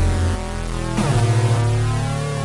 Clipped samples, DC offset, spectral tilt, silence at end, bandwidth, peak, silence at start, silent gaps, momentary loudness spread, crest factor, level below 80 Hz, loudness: under 0.1%; under 0.1%; -6 dB/octave; 0 s; 11.5 kHz; -8 dBFS; 0 s; none; 8 LU; 10 dB; -28 dBFS; -20 LUFS